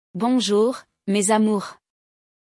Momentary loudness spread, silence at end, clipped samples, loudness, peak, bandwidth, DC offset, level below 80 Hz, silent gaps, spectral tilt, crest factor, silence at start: 10 LU; 0.85 s; under 0.1%; -21 LUFS; -6 dBFS; 12 kHz; under 0.1%; -72 dBFS; none; -4.5 dB/octave; 16 dB; 0.15 s